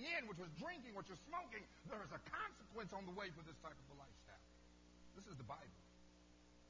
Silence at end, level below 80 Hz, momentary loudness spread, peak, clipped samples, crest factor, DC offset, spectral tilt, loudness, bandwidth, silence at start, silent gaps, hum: 0 s; -72 dBFS; 19 LU; -32 dBFS; under 0.1%; 22 dB; under 0.1%; -4.5 dB/octave; -53 LUFS; 8 kHz; 0 s; none; 60 Hz at -70 dBFS